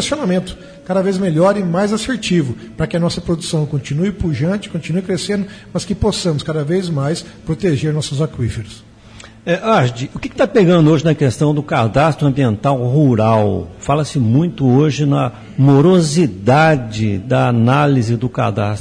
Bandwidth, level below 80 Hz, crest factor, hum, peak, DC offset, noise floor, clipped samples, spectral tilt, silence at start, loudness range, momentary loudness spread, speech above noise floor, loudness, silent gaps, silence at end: 10.5 kHz; -40 dBFS; 12 dB; none; -2 dBFS; under 0.1%; -39 dBFS; under 0.1%; -6.5 dB/octave; 0 s; 6 LU; 10 LU; 24 dB; -15 LUFS; none; 0 s